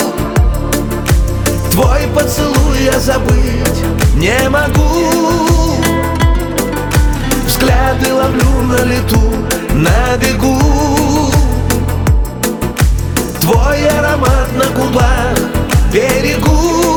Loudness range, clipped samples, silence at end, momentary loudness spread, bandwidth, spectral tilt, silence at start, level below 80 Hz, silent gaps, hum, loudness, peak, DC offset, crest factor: 1 LU; under 0.1%; 0 s; 4 LU; over 20 kHz; -5 dB/octave; 0 s; -16 dBFS; none; none; -12 LUFS; 0 dBFS; under 0.1%; 10 dB